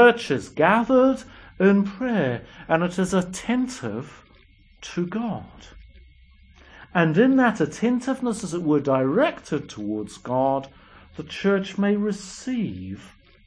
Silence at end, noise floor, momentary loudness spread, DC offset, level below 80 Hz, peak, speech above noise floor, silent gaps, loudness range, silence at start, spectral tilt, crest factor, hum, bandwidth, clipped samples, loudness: 0.4 s; -54 dBFS; 15 LU; under 0.1%; -54 dBFS; -4 dBFS; 31 dB; none; 7 LU; 0 s; -6 dB/octave; 20 dB; none; 10.5 kHz; under 0.1%; -23 LUFS